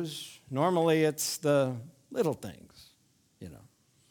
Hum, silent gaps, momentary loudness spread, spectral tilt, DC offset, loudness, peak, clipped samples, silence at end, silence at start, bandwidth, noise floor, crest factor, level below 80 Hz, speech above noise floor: none; none; 23 LU; -5 dB/octave; under 0.1%; -29 LUFS; -14 dBFS; under 0.1%; 0.5 s; 0 s; 19.5 kHz; -68 dBFS; 18 dB; -70 dBFS; 39 dB